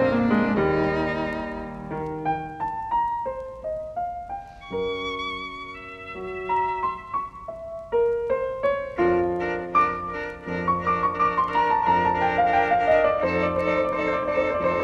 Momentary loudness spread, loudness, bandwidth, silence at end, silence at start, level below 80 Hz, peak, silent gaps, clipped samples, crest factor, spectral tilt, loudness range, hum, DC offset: 13 LU; -24 LUFS; 9.2 kHz; 0 s; 0 s; -48 dBFS; -8 dBFS; none; under 0.1%; 16 dB; -7 dB/octave; 8 LU; none; under 0.1%